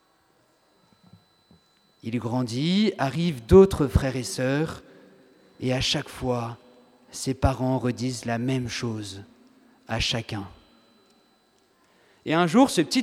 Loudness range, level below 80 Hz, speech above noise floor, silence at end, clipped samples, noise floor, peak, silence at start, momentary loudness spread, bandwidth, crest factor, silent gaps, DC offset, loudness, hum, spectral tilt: 9 LU; -42 dBFS; 41 dB; 0 s; under 0.1%; -64 dBFS; -4 dBFS; 2.05 s; 17 LU; 15 kHz; 22 dB; none; under 0.1%; -24 LUFS; none; -5.5 dB/octave